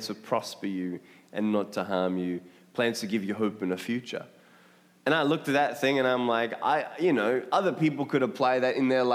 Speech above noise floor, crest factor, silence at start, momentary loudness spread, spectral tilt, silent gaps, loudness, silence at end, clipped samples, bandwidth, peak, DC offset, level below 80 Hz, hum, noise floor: 31 dB; 18 dB; 0 s; 9 LU; -5.5 dB/octave; none; -28 LUFS; 0 s; under 0.1%; 16 kHz; -10 dBFS; under 0.1%; -84 dBFS; none; -58 dBFS